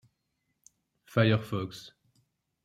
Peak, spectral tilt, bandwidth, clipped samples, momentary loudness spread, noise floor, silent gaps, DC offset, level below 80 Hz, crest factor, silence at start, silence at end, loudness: -10 dBFS; -7 dB/octave; 14 kHz; under 0.1%; 15 LU; -80 dBFS; none; under 0.1%; -68 dBFS; 22 dB; 1.15 s; 0.75 s; -29 LUFS